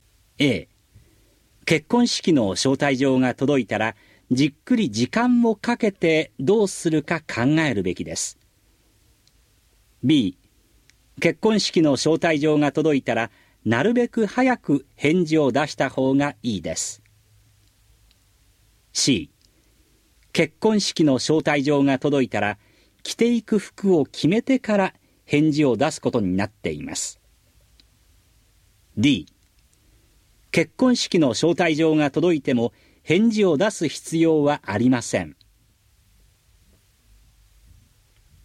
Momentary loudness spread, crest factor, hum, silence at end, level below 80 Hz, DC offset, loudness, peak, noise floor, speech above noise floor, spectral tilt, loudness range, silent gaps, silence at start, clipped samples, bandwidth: 8 LU; 20 dB; none; 3.15 s; -58 dBFS; under 0.1%; -21 LUFS; -4 dBFS; -60 dBFS; 40 dB; -5 dB/octave; 7 LU; none; 0.4 s; under 0.1%; 13.5 kHz